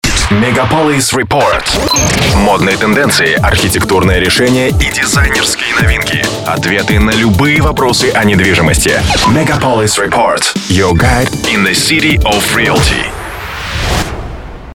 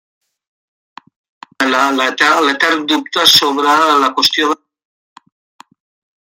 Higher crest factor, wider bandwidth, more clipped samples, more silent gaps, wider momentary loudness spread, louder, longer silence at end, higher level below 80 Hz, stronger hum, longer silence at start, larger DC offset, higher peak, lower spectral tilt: second, 10 dB vs 16 dB; first, 19 kHz vs 16.5 kHz; neither; neither; second, 5 LU vs 8 LU; about the same, -9 LUFS vs -11 LUFS; second, 0 s vs 1.65 s; first, -20 dBFS vs -68 dBFS; neither; second, 0.05 s vs 1.6 s; neither; about the same, 0 dBFS vs 0 dBFS; first, -4 dB/octave vs -1 dB/octave